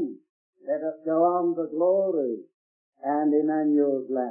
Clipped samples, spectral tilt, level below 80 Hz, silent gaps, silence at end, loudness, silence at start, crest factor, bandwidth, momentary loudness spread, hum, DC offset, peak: under 0.1%; -14 dB/octave; -90 dBFS; 0.29-0.53 s, 2.54-2.92 s; 0 s; -25 LUFS; 0 s; 14 dB; 2.2 kHz; 10 LU; none; under 0.1%; -12 dBFS